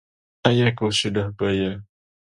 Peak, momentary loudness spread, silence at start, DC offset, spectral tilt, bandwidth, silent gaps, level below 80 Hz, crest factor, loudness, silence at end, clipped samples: 0 dBFS; 7 LU; 0.45 s; under 0.1%; -5.5 dB/octave; 11.5 kHz; none; -48 dBFS; 22 dB; -22 LUFS; 0.5 s; under 0.1%